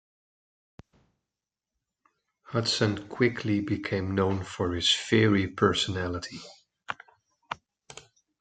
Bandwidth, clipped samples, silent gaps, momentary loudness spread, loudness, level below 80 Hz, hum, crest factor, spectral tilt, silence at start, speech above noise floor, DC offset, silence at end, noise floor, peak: 9.4 kHz; under 0.1%; none; 20 LU; -27 LUFS; -62 dBFS; none; 22 dB; -5 dB/octave; 2.5 s; 63 dB; under 0.1%; 0.4 s; -89 dBFS; -8 dBFS